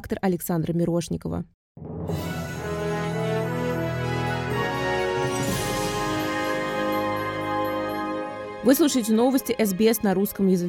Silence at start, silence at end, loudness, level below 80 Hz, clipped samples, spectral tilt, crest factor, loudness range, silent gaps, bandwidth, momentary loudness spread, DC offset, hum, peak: 0 s; 0 s; -25 LUFS; -48 dBFS; under 0.1%; -5.5 dB/octave; 18 dB; 5 LU; 1.54-1.75 s; 19 kHz; 10 LU; under 0.1%; none; -6 dBFS